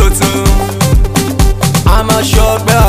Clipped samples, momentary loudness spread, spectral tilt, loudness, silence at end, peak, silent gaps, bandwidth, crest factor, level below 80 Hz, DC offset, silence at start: 0.6%; 3 LU; -4.5 dB/octave; -11 LUFS; 0 s; 0 dBFS; none; 16 kHz; 8 dB; -12 dBFS; under 0.1%; 0 s